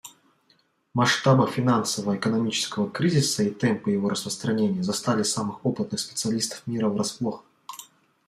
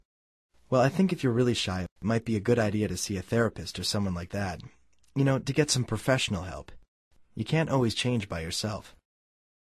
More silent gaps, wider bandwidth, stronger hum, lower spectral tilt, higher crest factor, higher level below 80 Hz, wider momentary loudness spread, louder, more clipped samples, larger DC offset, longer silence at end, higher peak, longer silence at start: second, none vs 1.91-1.96 s, 6.88-7.11 s; first, 15 kHz vs 13.5 kHz; neither; about the same, -4.5 dB/octave vs -5 dB/octave; about the same, 18 dB vs 18 dB; second, -66 dBFS vs -50 dBFS; about the same, 10 LU vs 10 LU; first, -25 LUFS vs -28 LUFS; neither; neither; second, 0.45 s vs 0.7 s; about the same, -8 dBFS vs -10 dBFS; second, 0.05 s vs 0.7 s